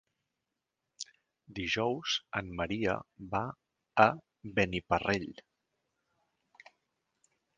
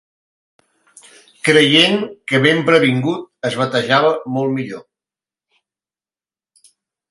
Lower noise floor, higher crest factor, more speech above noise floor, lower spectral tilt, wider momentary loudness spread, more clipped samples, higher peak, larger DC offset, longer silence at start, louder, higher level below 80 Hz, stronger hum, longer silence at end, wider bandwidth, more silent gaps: about the same, -87 dBFS vs under -90 dBFS; first, 28 dB vs 18 dB; second, 55 dB vs over 75 dB; about the same, -4.5 dB/octave vs -5 dB/octave; first, 19 LU vs 13 LU; neither; second, -8 dBFS vs 0 dBFS; neither; second, 1 s vs 1.45 s; second, -32 LUFS vs -15 LUFS; first, -58 dBFS vs -64 dBFS; neither; about the same, 2.25 s vs 2.3 s; second, 9.6 kHz vs 11.5 kHz; neither